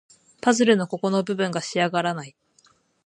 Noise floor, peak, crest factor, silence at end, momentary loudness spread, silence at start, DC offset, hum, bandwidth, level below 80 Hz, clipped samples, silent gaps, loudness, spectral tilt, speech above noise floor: -61 dBFS; -4 dBFS; 20 dB; 0.75 s; 9 LU; 0.45 s; under 0.1%; none; 11 kHz; -72 dBFS; under 0.1%; none; -23 LUFS; -4.5 dB/octave; 39 dB